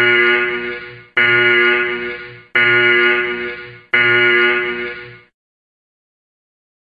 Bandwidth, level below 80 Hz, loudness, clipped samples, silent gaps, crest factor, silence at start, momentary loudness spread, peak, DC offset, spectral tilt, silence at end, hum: 6 kHz; -56 dBFS; -13 LUFS; under 0.1%; none; 14 dB; 0 s; 15 LU; -2 dBFS; under 0.1%; -6 dB/octave; 1.65 s; none